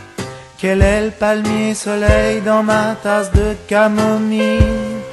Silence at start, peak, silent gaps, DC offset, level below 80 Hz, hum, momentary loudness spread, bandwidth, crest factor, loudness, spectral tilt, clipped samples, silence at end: 0 s; 0 dBFS; none; under 0.1%; -24 dBFS; none; 6 LU; 12.5 kHz; 14 dB; -15 LUFS; -6 dB/octave; under 0.1%; 0 s